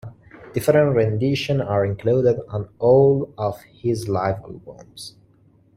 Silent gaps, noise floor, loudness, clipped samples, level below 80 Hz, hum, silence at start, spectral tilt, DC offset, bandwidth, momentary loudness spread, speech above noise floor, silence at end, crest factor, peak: none; -56 dBFS; -20 LUFS; under 0.1%; -52 dBFS; none; 0.05 s; -7 dB/octave; under 0.1%; 16 kHz; 22 LU; 36 dB; 0.65 s; 18 dB; -4 dBFS